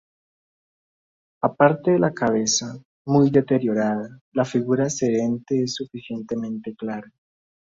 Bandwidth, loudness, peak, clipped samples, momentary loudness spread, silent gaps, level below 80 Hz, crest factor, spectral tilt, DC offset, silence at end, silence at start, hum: 7.8 kHz; -22 LUFS; -2 dBFS; under 0.1%; 13 LU; 2.85-3.05 s, 4.21-4.32 s; -62 dBFS; 20 dB; -5 dB/octave; under 0.1%; 0.75 s; 1.45 s; none